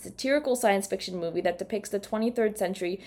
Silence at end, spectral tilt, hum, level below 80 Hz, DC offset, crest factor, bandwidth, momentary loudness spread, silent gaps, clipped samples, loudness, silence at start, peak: 0 s; -4 dB/octave; none; -62 dBFS; under 0.1%; 16 dB; 19 kHz; 7 LU; none; under 0.1%; -28 LUFS; 0 s; -12 dBFS